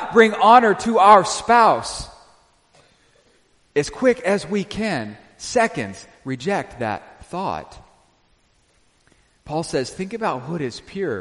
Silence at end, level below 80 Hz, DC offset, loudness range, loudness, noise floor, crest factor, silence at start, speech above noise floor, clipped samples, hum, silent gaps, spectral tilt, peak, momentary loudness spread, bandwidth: 0 s; -52 dBFS; under 0.1%; 13 LU; -19 LUFS; -60 dBFS; 20 dB; 0 s; 42 dB; under 0.1%; none; none; -4.5 dB/octave; 0 dBFS; 20 LU; 11.5 kHz